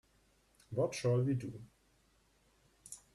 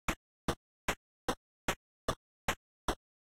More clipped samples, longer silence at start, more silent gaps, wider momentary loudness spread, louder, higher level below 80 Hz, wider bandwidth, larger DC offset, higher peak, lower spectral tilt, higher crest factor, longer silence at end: neither; first, 0.7 s vs 0.1 s; second, none vs 0.16-0.48 s, 0.57-0.88 s, 0.97-1.28 s, 1.37-1.68 s, 1.76-2.08 s, 2.16-2.48 s, 2.56-2.88 s; first, 19 LU vs 2 LU; first, -36 LUFS vs -40 LUFS; second, -70 dBFS vs -50 dBFS; second, 12.5 kHz vs 16 kHz; neither; about the same, -22 dBFS vs -22 dBFS; first, -6.5 dB/octave vs -3.5 dB/octave; about the same, 18 dB vs 20 dB; second, 0.15 s vs 0.35 s